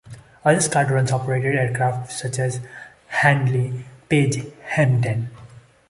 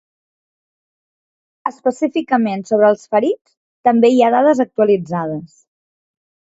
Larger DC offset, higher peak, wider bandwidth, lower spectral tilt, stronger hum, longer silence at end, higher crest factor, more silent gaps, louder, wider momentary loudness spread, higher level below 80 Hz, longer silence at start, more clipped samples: neither; about the same, -2 dBFS vs 0 dBFS; first, 11.5 kHz vs 8 kHz; about the same, -5.5 dB/octave vs -6.5 dB/octave; neither; second, 0.3 s vs 1.1 s; about the same, 18 dB vs 18 dB; second, none vs 3.41-3.45 s, 3.57-3.84 s; second, -21 LUFS vs -16 LUFS; about the same, 11 LU vs 13 LU; first, -54 dBFS vs -64 dBFS; second, 0.05 s vs 1.65 s; neither